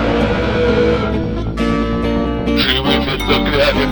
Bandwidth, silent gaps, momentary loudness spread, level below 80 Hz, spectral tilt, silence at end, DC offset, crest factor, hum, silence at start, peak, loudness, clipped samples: over 20 kHz; none; 5 LU; -24 dBFS; -6 dB/octave; 0 s; under 0.1%; 14 dB; none; 0 s; 0 dBFS; -15 LUFS; under 0.1%